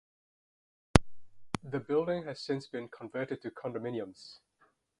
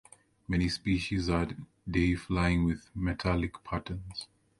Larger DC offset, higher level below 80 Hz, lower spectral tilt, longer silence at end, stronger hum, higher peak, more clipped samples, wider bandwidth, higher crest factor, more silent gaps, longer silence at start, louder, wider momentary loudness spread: neither; about the same, -46 dBFS vs -42 dBFS; about the same, -6 dB/octave vs -6.5 dB/octave; first, 0.65 s vs 0.35 s; neither; first, 0 dBFS vs -14 dBFS; neither; about the same, 11.5 kHz vs 11.5 kHz; first, 36 dB vs 18 dB; neither; first, 0.95 s vs 0.5 s; second, -34 LUFS vs -31 LUFS; first, 14 LU vs 11 LU